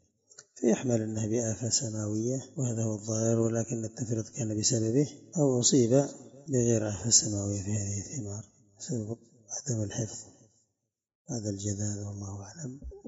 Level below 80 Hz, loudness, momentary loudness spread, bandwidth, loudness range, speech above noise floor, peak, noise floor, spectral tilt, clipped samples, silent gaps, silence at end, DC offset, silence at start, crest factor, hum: -60 dBFS; -29 LUFS; 17 LU; 8 kHz; 11 LU; 53 dB; -8 dBFS; -83 dBFS; -4.5 dB/octave; under 0.1%; 11.15-11.25 s; 0 s; under 0.1%; 0.4 s; 22 dB; none